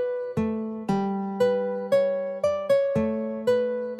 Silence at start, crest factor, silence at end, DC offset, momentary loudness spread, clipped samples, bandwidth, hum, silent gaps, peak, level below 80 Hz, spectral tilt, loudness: 0 s; 12 dB; 0 s; under 0.1%; 5 LU; under 0.1%; 14 kHz; none; none; -12 dBFS; -58 dBFS; -7.5 dB/octave; -25 LUFS